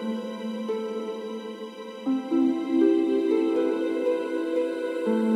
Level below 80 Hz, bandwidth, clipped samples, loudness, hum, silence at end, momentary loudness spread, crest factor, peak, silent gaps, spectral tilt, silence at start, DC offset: -84 dBFS; 11 kHz; under 0.1%; -26 LUFS; none; 0 s; 12 LU; 14 dB; -10 dBFS; none; -6.5 dB/octave; 0 s; under 0.1%